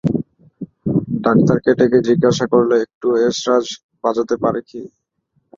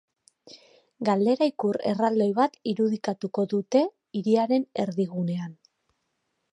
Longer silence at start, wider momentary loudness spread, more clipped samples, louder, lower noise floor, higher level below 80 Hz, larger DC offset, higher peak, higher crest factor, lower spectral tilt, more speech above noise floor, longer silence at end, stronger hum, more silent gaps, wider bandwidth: second, 0.05 s vs 0.45 s; first, 17 LU vs 7 LU; neither; first, -16 LUFS vs -26 LUFS; second, -66 dBFS vs -77 dBFS; first, -50 dBFS vs -76 dBFS; neither; first, -2 dBFS vs -8 dBFS; about the same, 16 dB vs 18 dB; about the same, -6.5 dB/octave vs -7 dB/octave; about the same, 51 dB vs 52 dB; second, 0.7 s vs 1 s; neither; first, 2.94-3.01 s, 3.83-3.89 s vs none; second, 7.6 kHz vs 10 kHz